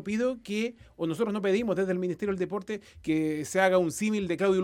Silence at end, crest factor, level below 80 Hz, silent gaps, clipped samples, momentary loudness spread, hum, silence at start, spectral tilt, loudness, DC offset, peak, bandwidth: 0 s; 18 dB; -60 dBFS; none; under 0.1%; 10 LU; none; 0 s; -5.5 dB/octave; -29 LUFS; under 0.1%; -10 dBFS; 16 kHz